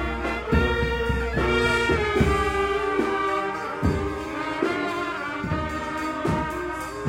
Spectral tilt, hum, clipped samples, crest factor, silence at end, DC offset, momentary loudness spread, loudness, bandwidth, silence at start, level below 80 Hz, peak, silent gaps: -6 dB/octave; none; under 0.1%; 18 dB; 0 s; under 0.1%; 7 LU; -25 LUFS; 16 kHz; 0 s; -34 dBFS; -6 dBFS; none